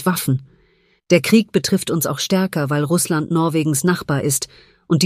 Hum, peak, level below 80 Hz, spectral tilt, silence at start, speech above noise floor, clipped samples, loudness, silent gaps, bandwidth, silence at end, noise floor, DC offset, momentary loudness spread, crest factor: none; 0 dBFS; -56 dBFS; -5 dB/octave; 0 s; 40 dB; under 0.1%; -18 LUFS; none; 15.5 kHz; 0 s; -58 dBFS; under 0.1%; 6 LU; 18 dB